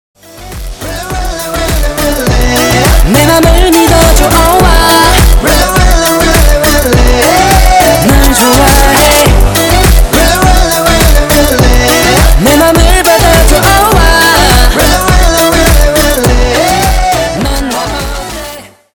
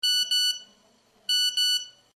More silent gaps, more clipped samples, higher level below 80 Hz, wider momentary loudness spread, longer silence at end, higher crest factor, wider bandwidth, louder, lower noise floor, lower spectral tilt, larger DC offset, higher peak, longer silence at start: neither; first, 3% vs under 0.1%; first, -10 dBFS vs -82 dBFS; about the same, 9 LU vs 11 LU; about the same, 0.25 s vs 0.25 s; second, 6 dB vs 12 dB; first, over 20 kHz vs 12.5 kHz; first, -6 LUFS vs -23 LUFS; second, -26 dBFS vs -62 dBFS; first, -4 dB/octave vs 5 dB/octave; neither; first, 0 dBFS vs -14 dBFS; first, 0.35 s vs 0.05 s